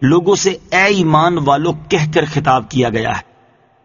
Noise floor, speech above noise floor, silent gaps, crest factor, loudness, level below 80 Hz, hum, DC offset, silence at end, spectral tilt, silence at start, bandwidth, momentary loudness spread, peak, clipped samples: -51 dBFS; 38 dB; none; 14 dB; -14 LUFS; -44 dBFS; none; under 0.1%; 0.6 s; -4.5 dB/octave; 0 s; 7.4 kHz; 5 LU; 0 dBFS; under 0.1%